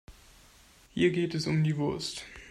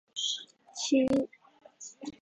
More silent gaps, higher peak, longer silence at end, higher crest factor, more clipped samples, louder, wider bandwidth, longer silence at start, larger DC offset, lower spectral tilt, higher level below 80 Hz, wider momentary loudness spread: neither; about the same, -14 dBFS vs -16 dBFS; about the same, 0 s vs 0.05 s; about the same, 18 dB vs 18 dB; neither; about the same, -29 LUFS vs -30 LUFS; first, 12.5 kHz vs 9.2 kHz; about the same, 0.1 s vs 0.15 s; neither; first, -6 dB/octave vs -3 dB/octave; first, -58 dBFS vs -68 dBFS; second, 12 LU vs 20 LU